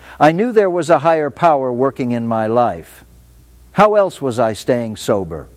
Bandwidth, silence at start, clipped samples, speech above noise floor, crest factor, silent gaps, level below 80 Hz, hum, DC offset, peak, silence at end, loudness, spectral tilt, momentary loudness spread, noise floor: 15.5 kHz; 0.05 s; under 0.1%; 30 dB; 16 dB; none; -48 dBFS; none; under 0.1%; 0 dBFS; 0.1 s; -16 LUFS; -6.5 dB/octave; 7 LU; -45 dBFS